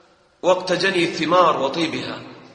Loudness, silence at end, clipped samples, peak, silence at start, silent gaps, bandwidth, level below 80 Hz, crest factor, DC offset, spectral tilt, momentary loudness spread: -19 LUFS; 0.1 s; under 0.1%; -2 dBFS; 0.45 s; none; 10 kHz; -62 dBFS; 18 dB; under 0.1%; -4.5 dB/octave; 12 LU